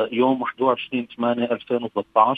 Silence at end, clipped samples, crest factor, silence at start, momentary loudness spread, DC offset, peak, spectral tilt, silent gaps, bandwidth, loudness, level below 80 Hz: 0 s; under 0.1%; 20 dB; 0 s; 5 LU; under 0.1%; -2 dBFS; -8 dB/octave; none; 4.7 kHz; -23 LUFS; -68 dBFS